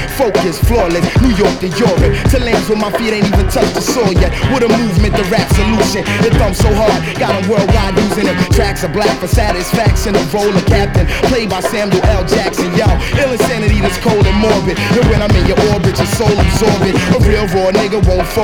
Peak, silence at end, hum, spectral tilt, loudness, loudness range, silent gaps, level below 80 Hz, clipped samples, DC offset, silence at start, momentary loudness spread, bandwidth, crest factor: 0 dBFS; 0 s; none; -5.5 dB/octave; -12 LUFS; 1 LU; none; -18 dBFS; under 0.1%; under 0.1%; 0 s; 3 LU; over 20 kHz; 12 dB